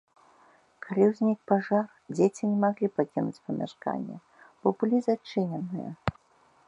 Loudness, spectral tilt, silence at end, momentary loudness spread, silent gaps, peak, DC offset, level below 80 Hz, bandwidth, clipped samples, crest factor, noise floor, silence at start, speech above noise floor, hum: -28 LUFS; -7.5 dB/octave; 0.55 s; 10 LU; none; -6 dBFS; under 0.1%; -60 dBFS; 9.8 kHz; under 0.1%; 22 dB; -63 dBFS; 0.85 s; 36 dB; none